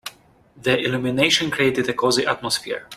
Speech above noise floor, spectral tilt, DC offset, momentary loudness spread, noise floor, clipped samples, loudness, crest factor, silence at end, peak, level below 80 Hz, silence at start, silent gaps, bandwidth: 31 dB; -3.5 dB/octave; under 0.1%; 7 LU; -52 dBFS; under 0.1%; -20 LUFS; 20 dB; 0 s; -2 dBFS; -56 dBFS; 0.05 s; none; 15.5 kHz